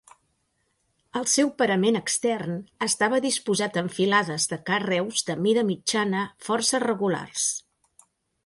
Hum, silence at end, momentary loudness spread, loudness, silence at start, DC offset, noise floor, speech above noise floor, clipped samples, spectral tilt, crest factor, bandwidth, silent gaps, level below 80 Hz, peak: none; 0.85 s; 6 LU; -24 LUFS; 1.15 s; under 0.1%; -72 dBFS; 48 dB; under 0.1%; -3 dB/octave; 18 dB; 11.5 kHz; none; -68 dBFS; -6 dBFS